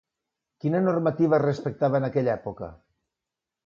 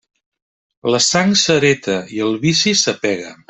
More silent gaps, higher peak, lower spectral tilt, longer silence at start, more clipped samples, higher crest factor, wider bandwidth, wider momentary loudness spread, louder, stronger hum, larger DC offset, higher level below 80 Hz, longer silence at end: neither; second, -10 dBFS vs -2 dBFS; first, -9 dB/octave vs -3 dB/octave; second, 0.65 s vs 0.85 s; neither; about the same, 16 dB vs 16 dB; second, 7.2 kHz vs 8.4 kHz; first, 13 LU vs 8 LU; second, -25 LUFS vs -15 LUFS; neither; neither; second, -60 dBFS vs -54 dBFS; first, 0.95 s vs 0.15 s